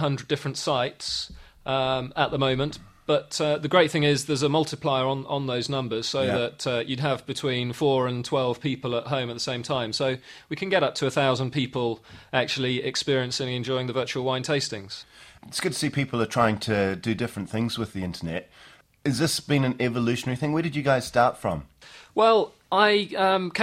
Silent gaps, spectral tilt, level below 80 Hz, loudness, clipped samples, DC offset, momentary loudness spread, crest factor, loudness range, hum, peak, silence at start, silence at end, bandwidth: none; -5 dB/octave; -58 dBFS; -25 LUFS; under 0.1%; under 0.1%; 9 LU; 22 dB; 3 LU; none; -4 dBFS; 0 s; 0 s; 15.5 kHz